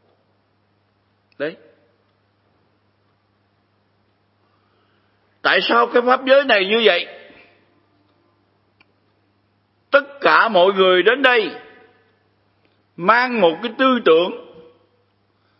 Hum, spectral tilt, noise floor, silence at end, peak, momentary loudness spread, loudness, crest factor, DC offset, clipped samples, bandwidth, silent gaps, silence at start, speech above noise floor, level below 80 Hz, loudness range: none; -6.5 dB/octave; -63 dBFS; 1.2 s; 0 dBFS; 15 LU; -16 LUFS; 20 dB; under 0.1%; under 0.1%; 5.8 kHz; none; 1.4 s; 48 dB; -76 dBFS; 20 LU